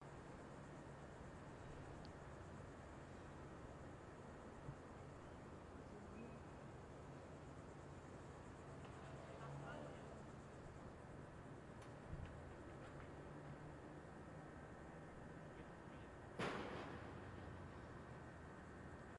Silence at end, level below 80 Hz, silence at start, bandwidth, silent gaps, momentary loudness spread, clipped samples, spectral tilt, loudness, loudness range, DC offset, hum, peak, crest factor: 0 s; -68 dBFS; 0 s; 11 kHz; none; 4 LU; under 0.1%; -6.5 dB/octave; -56 LUFS; 4 LU; under 0.1%; none; -34 dBFS; 22 dB